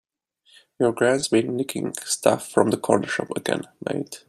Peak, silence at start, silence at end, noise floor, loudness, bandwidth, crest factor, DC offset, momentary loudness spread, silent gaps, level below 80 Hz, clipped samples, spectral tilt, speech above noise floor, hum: -2 dBFS; 0.8 s; 0.1 s; -62 dBFS; -23 LUFS; 15.5 kHz; 22 dB; under 0.1%; 9 LU; none; -66 dBFS; under 0.1%; -4.5 dB/octave; 39 dB; none